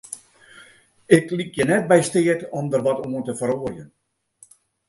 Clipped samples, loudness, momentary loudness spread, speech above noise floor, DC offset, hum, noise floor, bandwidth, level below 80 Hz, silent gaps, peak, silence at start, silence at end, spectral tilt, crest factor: under 0.1%; -21 LUFS; 15 LU; 35 dB; under 0.1%; none; -55 dBFS; 11.5 kHz; -58 dBFS; none; 0 dBFS; 0.1 s; 1.05 s; -5.5 dB/octave; 22 dB